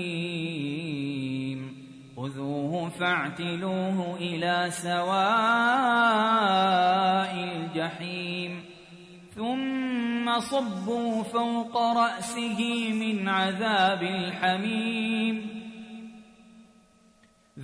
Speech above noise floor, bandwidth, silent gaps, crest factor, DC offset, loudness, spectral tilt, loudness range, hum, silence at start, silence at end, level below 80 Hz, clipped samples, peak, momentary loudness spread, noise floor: 35 dB; 11 kHz; none; 16 dB; under 0.1%; -27 LUFS; -5 dB/octave; 8 LU; none; 0 s; 0 s; -70 dBFS; under 0.1%; -12 dBFS; 14 LU; -61 dBFS